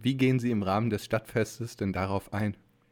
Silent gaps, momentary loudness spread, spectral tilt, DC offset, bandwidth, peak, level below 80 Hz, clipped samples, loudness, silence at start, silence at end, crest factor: none; 8 LU; -6.5 dB/octave; under 0.1%; 17.5 kHz; -14 dBFS; -58 dBFS; under 0.1%; -30 LUFS; 0 s; 0.35 s; 16 dB